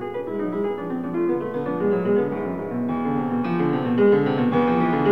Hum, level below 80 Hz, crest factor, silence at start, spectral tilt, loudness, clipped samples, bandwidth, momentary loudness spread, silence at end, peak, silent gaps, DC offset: none; -56 dBFS; 14 dB; 0 s; -9.5 dB/octave; -22 LUFS; under 0.1%; 5.4 kHz; 9 LU; 0 s; -8 dBFS; none; 0.4%